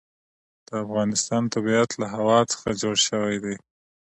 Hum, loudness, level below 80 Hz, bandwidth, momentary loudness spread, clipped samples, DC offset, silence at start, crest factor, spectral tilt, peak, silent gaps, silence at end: none; -23 LUFS; -60 dBFS; 11.5 kHz; 11 LU; under 0.1%; under 0.1%; 0.7 s; 18 dB; -3.5 dB/octave; -6 dBFS; none; 0.55 s